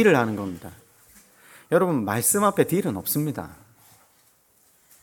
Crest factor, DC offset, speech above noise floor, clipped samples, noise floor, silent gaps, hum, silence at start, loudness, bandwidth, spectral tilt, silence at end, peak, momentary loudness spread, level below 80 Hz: 20 dB; under 0.1%; 39 dB; under 0.1%; -61 dBFS; none; none; 0 s; -23 LUFS; 19 kHz; -5 dB/octave; 1.5 s; -4 dBFS; 17 LU; -62 dBFS